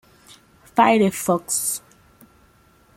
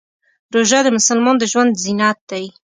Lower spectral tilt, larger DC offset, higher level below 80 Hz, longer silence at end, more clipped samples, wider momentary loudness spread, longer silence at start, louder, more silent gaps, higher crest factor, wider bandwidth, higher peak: first, -4 dB/octave vs -2.5 dB/octave; neither; about the same, -62 dBFS vs -64 dBFS; first, 1.2 s vs 0.25 s; neither; about the same, 9 LU vs 11 LU; first, 0.75 s vs 0.5 s; second, -20 LUFS vs -15 LUFS; second, none vs 2.21-2.27 s; about the same, 20 dB vs 16 dB; first, 16.5 kHz vs 9.6 kHz; about the same, -2 dBFS vs 0 dBFS